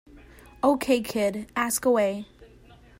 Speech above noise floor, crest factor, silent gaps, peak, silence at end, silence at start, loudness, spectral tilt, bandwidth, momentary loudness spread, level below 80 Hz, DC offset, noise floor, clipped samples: 28 dB; 18 dB; none; -8 dBFS; 0.55 s; 0.15 s; -25 LUFS; -4 dB/octave; 16.5 kHz; 7 LU; -56 dBFS; under 0.1%; -52 dBFS; under 0.1%